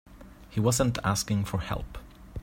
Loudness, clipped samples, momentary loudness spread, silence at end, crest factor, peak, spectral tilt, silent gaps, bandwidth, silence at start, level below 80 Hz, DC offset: -28 LUFS; under 0.1%; 19 LU; 0 s; 20 dB; -10 dBFS; -5 dB/octave; none; 16.5 kHz; 0.1 s; -44 dBFS; under 0.1%